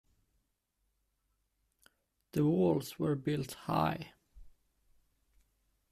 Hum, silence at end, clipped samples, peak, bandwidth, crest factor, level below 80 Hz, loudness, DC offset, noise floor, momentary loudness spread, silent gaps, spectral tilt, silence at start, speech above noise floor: none; 1.4 s; under 0.1%; -18 dBFS; 14.5 kHz; 20 dB; -66 dBFS; -34 LUFS; under 0.1%; -81 dBFS; 10 LU; none; -7 dB/octave; 2.35 s; 49 dB